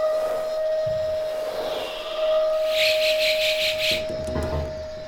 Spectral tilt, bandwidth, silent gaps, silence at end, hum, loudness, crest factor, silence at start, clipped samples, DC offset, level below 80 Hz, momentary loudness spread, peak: -3 dB/octave; 17 kHz; none; 0 s; none; -23 LUFS; 14 dB; 0 s; under 0.1%; under 0.1%; -42 dBFS; 9 LU; -10 dBFS